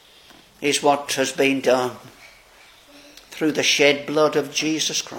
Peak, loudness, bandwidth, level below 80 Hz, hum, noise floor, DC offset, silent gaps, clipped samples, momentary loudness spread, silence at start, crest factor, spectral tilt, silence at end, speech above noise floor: -2 dBFS; -20 LUFS; 17 kHz; -64 dBFS; none; -50 dBFS; under 0.1%; none; under 0.1%; 9 LU; 0.6 s; 20 dB; -2.5 dB/octave; 0 s; 30 dB